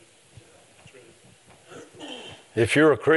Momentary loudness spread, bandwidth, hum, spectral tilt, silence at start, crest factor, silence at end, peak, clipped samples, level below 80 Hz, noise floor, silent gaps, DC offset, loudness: 27 LU; 11.5 kHz; none; -5.5 dB/octave; 1.75 s; 20 dB; 0 s; -6 dBFS; under 0.1%; -66 dBFS; -54 dBFS; none; under 0.1%; -21 LUFS